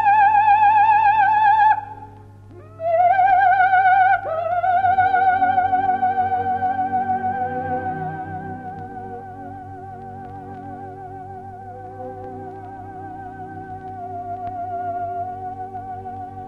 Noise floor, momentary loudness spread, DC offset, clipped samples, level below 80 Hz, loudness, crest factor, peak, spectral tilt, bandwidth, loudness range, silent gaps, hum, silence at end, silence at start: -42 dBFS; 21 LU; under 0.1%; under 0.1%; -54 dBFS; -18 LUFS; 14 dB; -6 dBFS; -7 dB/octave; 5 kHz; 18 LU; none; none; 0 s; 0 s